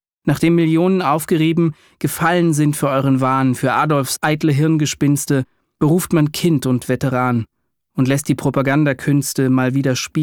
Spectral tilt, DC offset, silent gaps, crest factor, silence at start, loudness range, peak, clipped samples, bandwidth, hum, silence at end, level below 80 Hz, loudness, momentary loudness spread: -6 dB/octave; under 0.1%; none; 12 dB; 0.25 s; 2 LU; -4 dBFS; under 0.1%; 19.5 kHz; none; 0 s; -52 dBFS; -17 LUFS; 5 LU